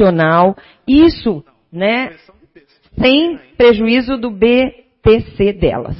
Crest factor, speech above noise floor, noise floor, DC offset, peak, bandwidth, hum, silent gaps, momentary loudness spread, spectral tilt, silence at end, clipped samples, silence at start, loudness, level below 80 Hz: 14 dB; 36 dB; -48 dBFS; under 0.1%; 0 dBFS; 5.8 kHz; none; none; 10 LU; -10.5 dB/octave; 0 s; under 0.1%; 0 s; -13 LUFS; -34 dBFS